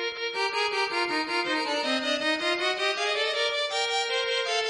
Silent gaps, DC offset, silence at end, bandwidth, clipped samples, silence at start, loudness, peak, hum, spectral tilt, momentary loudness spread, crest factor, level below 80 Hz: none; under 0.1%; 0 s; 11 kHz; under 0.1%; 0 s; -26 LUFS; -14 dBFS; none; -0.5 dB/octave; 1 LU; 12 dB; -70 dBFS